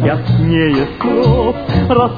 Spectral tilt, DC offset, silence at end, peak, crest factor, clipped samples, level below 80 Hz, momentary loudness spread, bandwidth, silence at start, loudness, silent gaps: -9.5 dB/octave; under 0.1%; 0 s; 0 dBFS; 12 dB; under 0.1%; -28 dBFS; 4 LU; 5 kHz; 0 s; -13 LUFS; none